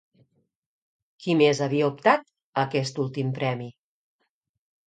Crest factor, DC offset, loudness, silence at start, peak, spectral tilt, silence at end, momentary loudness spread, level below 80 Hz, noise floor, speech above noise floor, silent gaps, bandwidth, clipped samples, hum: 24 dB; under 0.1%; -25 LUFS; 1.2 s; -4 dBFS; -6 dB/octave; 1.15 s; 12 LU; -72 dBFS; -78 dBFS; 54 dB; 2.42-2.53 s; 9.2 kHz; under 0.1%; none